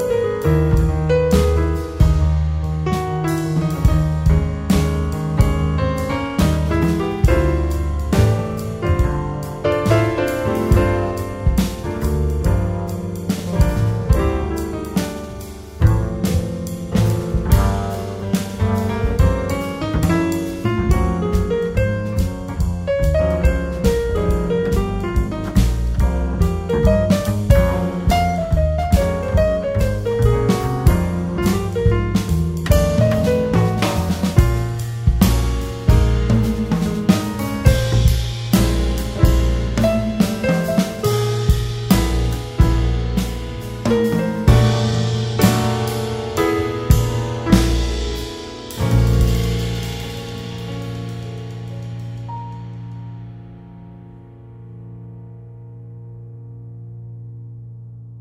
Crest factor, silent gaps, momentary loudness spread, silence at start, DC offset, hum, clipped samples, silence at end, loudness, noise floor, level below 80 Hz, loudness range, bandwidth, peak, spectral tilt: 18 dB; none; 14 LU; 0 s; under 0.1%; none; under 0.1%; 0 s; -19 LUFS; -39 dBFS; -22 dBFS; 11 LU; 16 kHz; 0 dBFS; -6.5 dB/octave